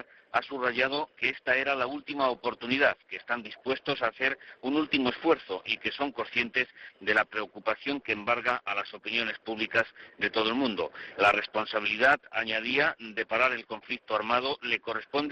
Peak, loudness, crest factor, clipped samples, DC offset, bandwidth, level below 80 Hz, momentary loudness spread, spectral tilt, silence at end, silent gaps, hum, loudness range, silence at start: -10 dBFS; -29 LUFS; 18 dB; under 0.1%; under 0.1%; 6.8 kHz; -66 dBFS; 8 LU; -0.5 dB/octave; 0 s; none; none; 3 LU; 0.35 s